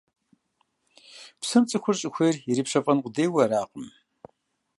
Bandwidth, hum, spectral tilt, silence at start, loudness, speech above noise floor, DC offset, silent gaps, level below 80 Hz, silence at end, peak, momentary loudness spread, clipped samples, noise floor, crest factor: 11.5 kHz; none; -5 dB/octave; 1.15 s; -24 LUFS; 49 dB; under 0.1%; none; -72 dBFS; 0.9 s; -6 dBFS; 20 LU; under 0.1%; -73 dBFS; 20 dB